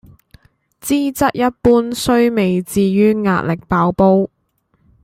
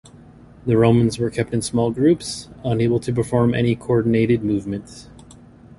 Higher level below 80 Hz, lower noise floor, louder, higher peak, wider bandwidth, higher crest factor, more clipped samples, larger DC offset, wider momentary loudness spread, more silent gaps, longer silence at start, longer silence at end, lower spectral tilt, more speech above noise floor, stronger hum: about the same, -42 dBFS vs -46 dBFS; first, -63 dBFS vs -45 dBFS; first, -15 LUFS vs -20 LUFS; about the same, -2 dBFS vs -2 dBFS; first, 16.5 kHz vs 11.5 kHz; about the same, 14 dB vs 18 dB; neither; neither; second, 5 LU vs 12 LU; neither; first, 0.85 s vs 0.65 s; about the same, 0.8 s vs 0.75 s; about the same, -6 dB/octave vs -7 dB/octave; first, 49 dB vs 26 dB; neither